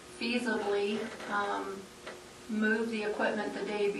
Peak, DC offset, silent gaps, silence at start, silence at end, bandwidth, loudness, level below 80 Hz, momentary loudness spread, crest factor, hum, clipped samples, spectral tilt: -18 dBFS; under 0.1%; none; 0 s; 0 s; 12.5 kHz; -33 LUFS; -68 dBFS; 15 LU; 16 dB; none; under 0.1%; -4.5 dB/octave